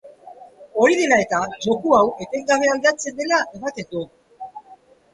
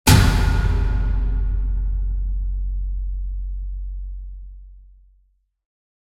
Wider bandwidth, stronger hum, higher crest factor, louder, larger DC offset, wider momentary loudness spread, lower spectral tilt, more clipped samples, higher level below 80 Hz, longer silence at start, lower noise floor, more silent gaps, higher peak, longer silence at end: second, 11.5 kHz vs 16.5 kHz; neither; about the same, 18 dB vs 20 dB; first, -19 LUFS vs -23 LUFS; neither; first, 20 LU vs 16 LU; second, -3.5 dB/octave vs -5 dB/octave; neither; second, -60 dBFS vs -22 dBFS; about the same, 0.05 s vs 0.05 s; second, -49 dBFS vs -62 dBFS; neither; about the same, -2 dBFS vs 0 dBFS; second, 0.4 s vs 1.25 s